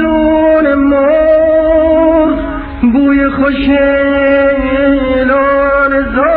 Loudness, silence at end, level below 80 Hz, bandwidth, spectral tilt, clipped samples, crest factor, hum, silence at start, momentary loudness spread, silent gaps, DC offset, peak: -9 LUFS; 0 s; -28 dBFS; 4.5 kHz; -4.5 dB/octave; under 0.1%; 8 dB; none; 0 s; 3 LU; none; 0.2%; 0 dBFS